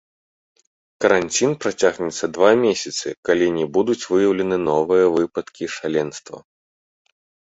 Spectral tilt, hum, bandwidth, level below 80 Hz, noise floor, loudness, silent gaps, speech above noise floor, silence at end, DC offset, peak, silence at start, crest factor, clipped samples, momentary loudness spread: -4 dB/octave; none; 8.2 kHz; -58 dBFS; under -90 dBFS; -19 LUFS; 3.17-3.23 s; over 71 dB; 1.15 s; under 0.1%; -2 dBFS; 1 s; 18 dB; under 0.1%; 10 LU